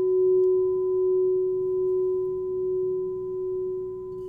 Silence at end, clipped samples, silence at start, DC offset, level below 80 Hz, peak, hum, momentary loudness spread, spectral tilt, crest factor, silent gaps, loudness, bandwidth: 0 s; under 0.1%; 0 s; under 0.1%; -58 dBFS; -16 dBFS; none; 9 LU; -12 dB/octave; 8 dB; none; -25 LUFS; 1.1 kHz